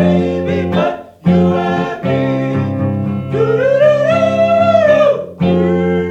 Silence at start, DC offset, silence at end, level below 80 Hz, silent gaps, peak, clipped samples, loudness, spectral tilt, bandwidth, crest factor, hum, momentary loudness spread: 0 s; under 0.1%; 0 s; -46 dBFS; none; 0 dBFS; under 0.1%; -13 LUFS; -8 dB/octave; 7.8 kHz; 12 dB; none; 7 LU